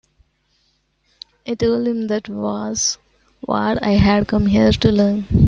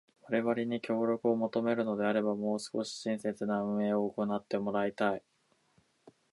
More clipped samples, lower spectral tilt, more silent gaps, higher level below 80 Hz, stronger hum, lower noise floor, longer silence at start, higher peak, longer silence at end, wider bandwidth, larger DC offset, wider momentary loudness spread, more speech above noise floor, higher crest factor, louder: neither; about the same, -5.5 dB/octave vs -6 dB/octave; neither; first, -34 dBFS vs -76 dBFS; neither; second, -64 dBFS vs -71 dBFS; first, 1.45 s vs 0.25 s; first, -2 dBFS vs -16 dBFS; second, 0 s vs 1.15 s; second, 7.6 kHz vs 11.5 kHz; neither; first, 11 LU vs 5 LU; first, 48 dB vs 39 dB; about the same, 16 dB vs 16 dB; first, -18 LUFS vs -33 LUFS